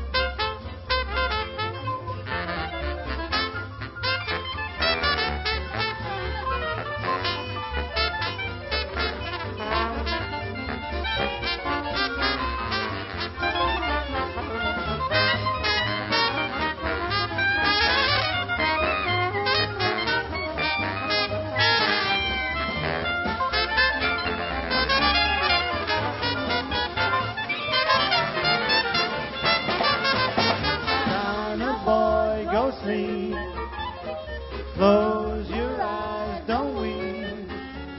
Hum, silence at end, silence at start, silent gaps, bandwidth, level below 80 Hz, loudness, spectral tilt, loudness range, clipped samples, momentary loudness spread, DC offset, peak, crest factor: none; 0 s; 0 s; none; 6 kHz; -38 dBFS; -24 LUFS; -8 dB/octave; 5 LU; under 0.1%; 10 LU; under 0.1%; -6 dBFS; 20 dB